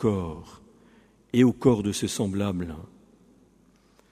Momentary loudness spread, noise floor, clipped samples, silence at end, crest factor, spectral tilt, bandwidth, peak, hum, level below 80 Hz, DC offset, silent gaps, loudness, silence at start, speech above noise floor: 17 LU; -60 dBFS; under 0.1%; 1.25 s; 22 dB; -6 dB/octave; 15 kHz; -6 dBFS; none; -52 dBFS; under 0.1%; none; -25 LUFS; 0 s; 36 dB